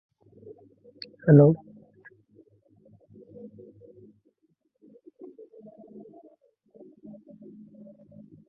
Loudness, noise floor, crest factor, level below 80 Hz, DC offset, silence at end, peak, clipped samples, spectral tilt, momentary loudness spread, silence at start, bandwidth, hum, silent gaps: -20 LUFS; -72 dBFS; 26 dB; -66 dBFS; under 0.1%; 6.95 s; -4 dBFS; under 0.1%; -9.5 dB/octave; 32 LU; 1.25 s; 5.4 kHz; none; none